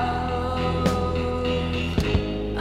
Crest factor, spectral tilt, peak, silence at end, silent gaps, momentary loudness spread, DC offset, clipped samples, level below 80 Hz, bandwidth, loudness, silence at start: 16 dB; -6.5 dB/octave; -8 dBFS; 0 s; none; 3 LU; under 0.1%; under 0.1%; -32 dBFS; 14 kHz; -25 LUFS; 0 s